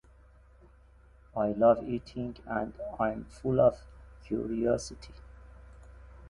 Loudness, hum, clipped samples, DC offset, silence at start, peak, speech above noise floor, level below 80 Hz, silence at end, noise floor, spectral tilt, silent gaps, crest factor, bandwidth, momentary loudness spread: -30 LUFS; none; under 0.1%; under 0.1%; 1.35 s; -12 dBFS; 28 dB; -52 dBFS; 0 s; -58 dBFS; -7 dB/octave; none; 20 dB; 11 kHz; 16 LU